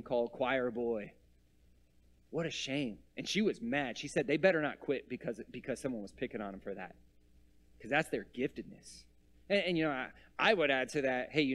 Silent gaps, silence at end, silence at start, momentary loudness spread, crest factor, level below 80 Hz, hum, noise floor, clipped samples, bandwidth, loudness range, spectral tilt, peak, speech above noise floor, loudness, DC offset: none; 0 s; 0 s; 14 LU; 22 dB; -66 dBFS; none; -67 dBFS; under 0.1%; 13 kHz; 6 LU; -4.5 dB/octave; -14 dBFS; 32 dB; -35 LUFS; under 0.1%